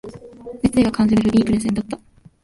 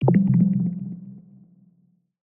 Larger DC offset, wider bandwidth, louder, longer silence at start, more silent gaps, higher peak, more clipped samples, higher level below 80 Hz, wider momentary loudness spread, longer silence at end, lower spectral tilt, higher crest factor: neither; first, 11.5 kHz vs 2.5 kHz; first, -18 LUFS vs -21 LUFS; about the same, 0.05 s vs 0 s; neither; about the same, -4 dBFS vs -4 dBFS; neither; first, -42 dBFS vs -58 dBFS; about the same, 21 LU vs 21 LU; second, 0.45 s vs 1.2 s; second, -6.5 dB/octave vs -13.5 dB/octave; about the same, 14 dB vs 18 dB